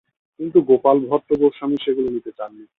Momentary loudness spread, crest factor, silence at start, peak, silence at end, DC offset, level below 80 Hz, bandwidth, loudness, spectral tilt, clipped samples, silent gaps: 15 LU; 18 dB; 0.4 s; -2 dBFS; 0.15 s; under 0.1%; -58 dBFS; 4 kHz; -18 LUFS; -9.5 dB/octave; under 0.1%; none